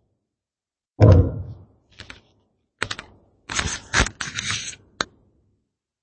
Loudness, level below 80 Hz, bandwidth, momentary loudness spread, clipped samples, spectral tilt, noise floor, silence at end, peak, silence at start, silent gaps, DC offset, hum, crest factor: -22 LUFS; -36 dBFS; 8.8 kHz; 23 LU; under 0.1%; -4.5 dB/octave; under -90 dBFS; 1 s; 0 dBFS; 1 s; none; under 0.1%; none; 24 dB